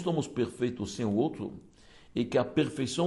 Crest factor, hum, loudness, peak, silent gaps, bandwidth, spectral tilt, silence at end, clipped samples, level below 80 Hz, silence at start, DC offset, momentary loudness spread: 18 dB; none; -31 LUFS; -14 dBFS; none; 11.5 kHz; -6 dB/octave; 0 s; under 0.1%; -62 dBFS; 0 s; under 0.1%; 11 LU